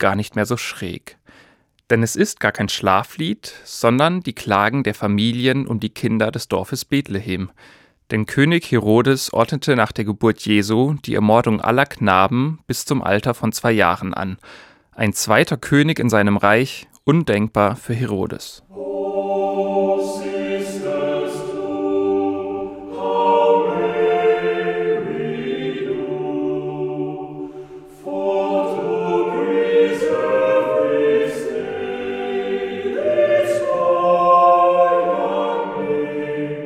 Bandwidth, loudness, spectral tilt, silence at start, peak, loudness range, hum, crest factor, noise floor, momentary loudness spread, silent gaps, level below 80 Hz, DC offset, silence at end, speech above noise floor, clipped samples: 17 kHz; -19 LUFS; -5.5 dB/octave; 0 s; -2 dBFS; 5 LU; none; 18 dB; -54 dBFS; 10 LU; none; -54 dBFS; under 0.1%; 0 s; 35 dB; under 0.1%